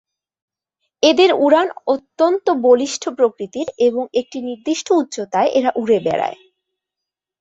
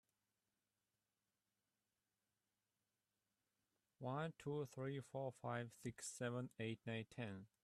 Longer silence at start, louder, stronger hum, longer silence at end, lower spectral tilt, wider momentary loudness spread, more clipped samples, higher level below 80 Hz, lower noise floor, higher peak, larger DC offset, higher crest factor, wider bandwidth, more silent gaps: second, 1 s vs 4 s; first, -17 LUFS vs -49 LUFS; neither; first, 1.05 s vs 0.2 s; second, -3.5 dB/octave vs -5.5 dB/octave; first, 10 LU vs 5 LU; neither; first, -64 dBFS vs -84 dBFS; second, -84 dBFS vs under -90 dBFS; first, -2 dBFS vs -32 dBFS; neither; about the same, 16 dB vs 20 dB; second, 8 kHz vs 13.5 kHz; neither